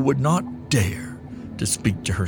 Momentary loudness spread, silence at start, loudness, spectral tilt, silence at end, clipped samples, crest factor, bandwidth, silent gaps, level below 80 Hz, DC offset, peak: 15 LU; 0 s; -23 LUFS; -5 dB/octave; 0 s; under 0.1%; 18 dB; over 20 kHz; none; -44 dBFS; under 0.1%; -6 dBFS